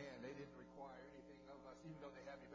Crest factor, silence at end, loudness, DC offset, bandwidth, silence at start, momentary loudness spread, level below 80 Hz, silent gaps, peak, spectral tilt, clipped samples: 16 dB; 0 s; -58 LUFS; under 0.1%; 8 kHz; 0 s; 7 LU; -76 dBFS; none; -42 dBFS; -6 dB/octave; under 0.1%